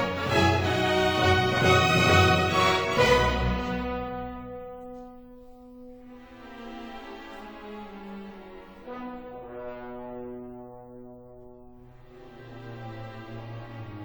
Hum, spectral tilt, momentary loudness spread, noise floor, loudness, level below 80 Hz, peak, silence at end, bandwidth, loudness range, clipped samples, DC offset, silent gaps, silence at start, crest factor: none; -5 dB/octave; 25 LU; -49 dBFS; -23 LUFS; -44 dBFS; -6 dBFS; 0 s; over 20 kHz; 21 LU; under 0.1%; under 0.1%; none; 0 s; 22 dB